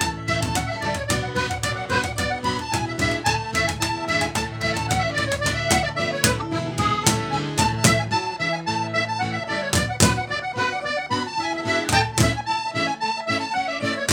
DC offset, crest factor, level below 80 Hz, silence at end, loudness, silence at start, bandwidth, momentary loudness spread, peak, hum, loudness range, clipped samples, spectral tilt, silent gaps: under 0.1%; 24 dB; -40 dBFS; 0 s; -22 LUFS; 0 s; over 20 kHz; 6 LU; 0 dBFS; none; 2 LU; under 0.1%; -3.5 dB/octave; none